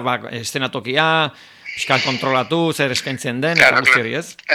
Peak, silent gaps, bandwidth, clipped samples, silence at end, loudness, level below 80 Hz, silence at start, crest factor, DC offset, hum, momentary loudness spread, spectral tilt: 0 dBFS; none; over 20 kHz; under 0.1%; 0 s; -17 LUFS; -60 dBFS; 0 s; 18 dB; under 0.1%; none; 13 LU; -3.5 dB/octave